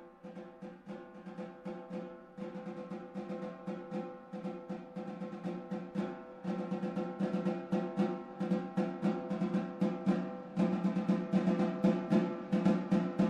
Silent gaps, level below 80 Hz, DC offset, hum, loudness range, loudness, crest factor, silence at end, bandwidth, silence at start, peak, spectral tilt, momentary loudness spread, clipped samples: none; -72 dBFS; under 0.1%; none; 11 LU; -36 LUFS; 20 dB; 0 s; 8.2 kHz; 0 s; -16 dBFS; -8.5 dB/octave; 15 LU; under 0.1%